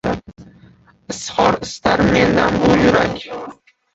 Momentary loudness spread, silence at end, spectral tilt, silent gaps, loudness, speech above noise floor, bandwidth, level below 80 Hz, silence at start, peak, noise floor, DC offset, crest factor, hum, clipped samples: 17 LU; 0.4 s; -5.5 dB/octave; none; -15 LUFS; 33 dB; 8.2 kHz; -38 dBFS; 0.05 s; 0 dBFS; -48 dBFS; under 0.1%; 16 dB; none; under 0.1%